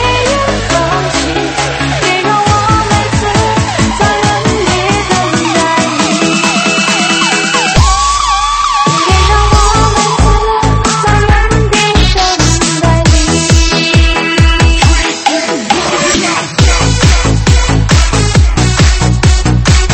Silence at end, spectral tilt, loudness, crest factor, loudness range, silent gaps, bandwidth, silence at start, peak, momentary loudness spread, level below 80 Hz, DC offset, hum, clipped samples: 0 s; -4 dB/octave; -9 LUFS; 8 dB; 2 LU; none; 8.8 kHz; 0 s; 0 dBFS; 3 LU; -14 dBFS; under 0.1%; none; 0.2%